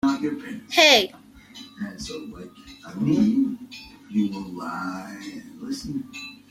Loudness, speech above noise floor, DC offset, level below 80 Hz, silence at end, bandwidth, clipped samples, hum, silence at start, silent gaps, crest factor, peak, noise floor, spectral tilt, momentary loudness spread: -22 LUFS; 21 dB; under 0.1%; -56 dBFS; 0.15 s; 15.5 kHz; under 0.1%; none; 0.05 s; none; 24 dB; -2 dBFS; -45 dBFS; -3.5 dB/octave; 24 LU